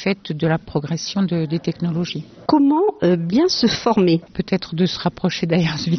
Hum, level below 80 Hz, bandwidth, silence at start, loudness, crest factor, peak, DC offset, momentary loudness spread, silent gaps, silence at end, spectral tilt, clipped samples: none; -50 dBFS; 6.4 kHz; 0 s; -19 LUFS; 16 dB; -2 dBFS; under 0.1%; 7 LU; none; 0 s; -5.5 dB/octave; under 0.1%